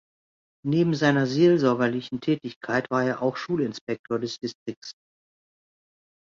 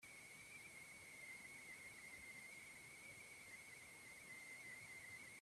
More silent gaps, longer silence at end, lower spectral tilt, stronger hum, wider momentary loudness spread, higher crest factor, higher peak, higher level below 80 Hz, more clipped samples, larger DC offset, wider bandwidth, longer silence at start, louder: first, 2.56-2.61 s, 3.81-3.87 s, 3.99-4.04 s, 4.55-4.66 s, 4.77-4.82 s vs none; first, 1.3 s vs 0 s; first, -6.5 dB/octave vs -1.5 dB/octave; neither; first, 14 LU vs 3 LU; first, 18 dB vs 12 dB; first, -8 dBFS vs -46 dBFS; first, -66 dBFS vs -86 dBFS; neither; neither; second, 7.6 kHz vs 15 kHz; first, 0.65 s vs 0 s; first, -25 LUFS vs -57 LUFS